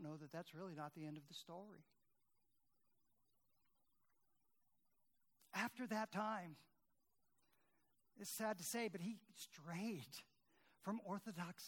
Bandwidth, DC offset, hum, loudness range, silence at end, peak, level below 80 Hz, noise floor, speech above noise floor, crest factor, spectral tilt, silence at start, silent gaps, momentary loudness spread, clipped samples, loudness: 19 kHz; under 0.1%; none; 10 LU; 0 s; -30 dBFS; under -90 dBFS; -88 dBFS; 39 dB; 22 dB; -4 dB/octave; 0 s; none; 13 LU; under 0.1%; -49 LUFS